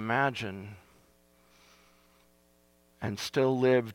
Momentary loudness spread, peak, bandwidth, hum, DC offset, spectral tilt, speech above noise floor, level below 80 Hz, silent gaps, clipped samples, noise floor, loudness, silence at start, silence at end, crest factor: 16 LU; -12 dBFS; 16.5 kHz; 60 Hz at -70 dBFS; under 0.1%; -5.5 dB/octave; 37 dB; -70 dBFS; none; under 0.1%; -66 dBFS; -30 LUFS; 0 s; 0 s; 20 dB